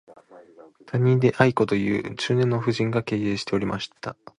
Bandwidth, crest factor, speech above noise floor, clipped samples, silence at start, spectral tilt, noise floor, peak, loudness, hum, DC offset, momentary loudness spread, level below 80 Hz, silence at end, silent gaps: 10.5 kHz; 22 dB; 27 dB; under 0.1%; 0.1 s; -7 dB/octave; -49 dBFS; -2 dBFS; -23 LUFS; none; under 0.1%; 10 LU; -56 dBFS; 0.25 s; none